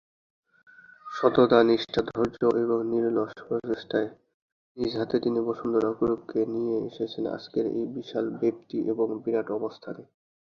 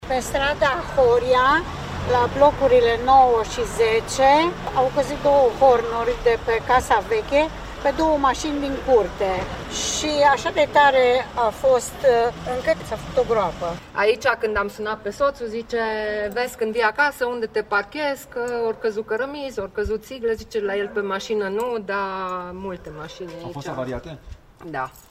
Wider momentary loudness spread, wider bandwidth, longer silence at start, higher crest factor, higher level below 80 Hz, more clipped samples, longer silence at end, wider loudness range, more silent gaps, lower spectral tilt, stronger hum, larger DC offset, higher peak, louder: about the same, 11 LU vs 13 LU; second, 7 kHz vs 15.5 kHz; first, 1.05 s vs 0 s; about the same, 22 dB vs 18 dB; second, -62 dBFS vs -40 dBFS; neither; first, 0.4 s vs 0.1 s; second, 5 LU vs 8 LU; first, 4.34-4.75 s vs none; first, -7.5 dB/octave vs -4 dB/octave; neither; neither; about the same, -4 dBFS vs -4 dBFS; second, -27 LUFS vs -21 LUFS